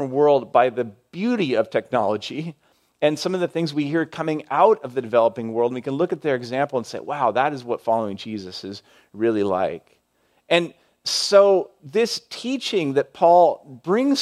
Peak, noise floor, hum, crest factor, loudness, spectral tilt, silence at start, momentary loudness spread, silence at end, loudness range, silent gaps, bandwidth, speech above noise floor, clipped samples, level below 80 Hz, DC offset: -2 dBFS; -65 dBFS; none; 18 dB; -21 LUFS; -5 dB/octave; 0 s; 14 LU; 0 s; 5 LU; none; 13.5 kHz; 44 dB; under 0.1%; -72 dBFS; under 0.1%